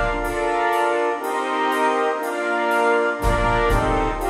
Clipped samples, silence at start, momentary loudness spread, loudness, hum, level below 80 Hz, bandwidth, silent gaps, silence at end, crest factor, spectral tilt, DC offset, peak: under 0.1%; 0 s; 4 LU; -20 LUFS; none; -30 dBFS; 16 kHz; none; 0 s; 12 dB; -5 dB/octave; under 0.1%; -8 dBFS